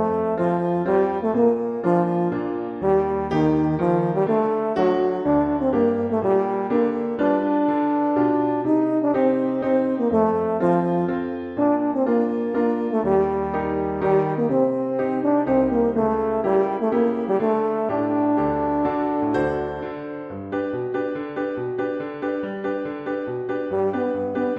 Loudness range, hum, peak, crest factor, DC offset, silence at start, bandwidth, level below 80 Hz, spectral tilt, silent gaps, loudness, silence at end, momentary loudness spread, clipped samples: 5 LU; none; -8 dBFS; 14 dB; under 0.1%; 0 s; 5.8 kHz; -50 dBFS; -9.5 dB/octave; none; -22 LUFS; 0 s; 7 LU; under 0.1%